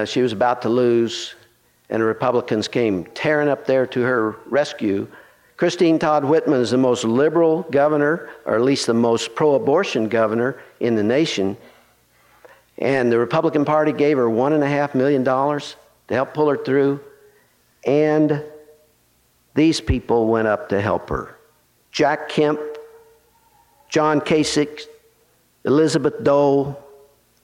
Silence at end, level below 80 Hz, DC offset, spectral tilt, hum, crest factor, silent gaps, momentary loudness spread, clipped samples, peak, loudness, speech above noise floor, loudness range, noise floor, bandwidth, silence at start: 0.65 s; -46 dBFS; under 0.1%; -5.5 dB/octave; none; 14 dB; none; 9 LU; under 0.1%; -6 dBFS; -19 LUFS; 42 dB; 4 LU; -60 dBFS; 12.5 kHz; 0 s